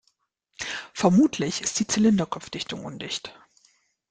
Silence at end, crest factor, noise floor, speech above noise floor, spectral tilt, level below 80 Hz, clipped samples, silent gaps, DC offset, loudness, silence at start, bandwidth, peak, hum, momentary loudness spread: 0.8 s; 20 dB; -71 dBFS; 48 dB; -4.5 dB/octave; -60 dBFS; under 0.1%; none; under 0.1%; -25 LUFS; 0.6 s; 9.6 kHz; -4 dBFS; none; 13 LU